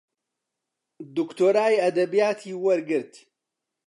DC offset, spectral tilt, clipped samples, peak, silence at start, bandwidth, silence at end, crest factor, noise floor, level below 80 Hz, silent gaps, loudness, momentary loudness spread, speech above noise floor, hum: under 0.1%; -5.5 dB/octave; under 0.1%; -8 dBFS; 1 s; 11.5 kHz; 0.8 s; 16 dB; -85 dBFS; -84 dBFS; none; -23 LUFS; 10 LU; 62 dB; none